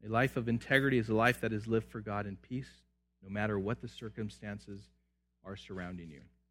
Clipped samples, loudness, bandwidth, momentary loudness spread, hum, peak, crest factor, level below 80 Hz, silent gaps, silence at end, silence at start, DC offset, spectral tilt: under 0.1%; -35 LUFS; 16 kHz; 20 LU; none; -12 dBFS; 24 dB; -60 dBFS; none; 0.3 s; 0 s; under 0.1%; -6.5 dB/octave